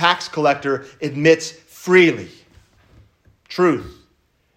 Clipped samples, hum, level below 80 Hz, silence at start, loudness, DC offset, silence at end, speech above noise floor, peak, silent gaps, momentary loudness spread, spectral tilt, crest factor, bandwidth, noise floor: under 0.1%; none; -56 dBFS; 0 s; -17 LUFS; under 0.1%; 0.65 s; 45 dB; 0 dBFS; none; 18 LU; -5 dB/octave; 18 dB; 15 kHz; -63 dBFS